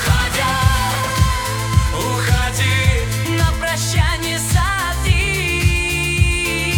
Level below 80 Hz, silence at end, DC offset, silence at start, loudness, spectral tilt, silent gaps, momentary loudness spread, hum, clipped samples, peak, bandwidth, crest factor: -22 dBFS; 0 s; under 0.1%; 0 s; -17 LUFS; -4 dB/octave; none; 3 LU; none; under 0.1%; -2 dBFS; 18.5 kHz; 14 dB